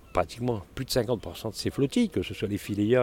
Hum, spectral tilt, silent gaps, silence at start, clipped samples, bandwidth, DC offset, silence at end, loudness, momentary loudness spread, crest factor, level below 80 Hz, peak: none; -6 dB/octave; none; 0.05 s; under 0.1%; 17 kHz; under 0.1%; 0 s; -29 LUFS; 7 LU; 18 dB; -50 dBFS; -10 dBFS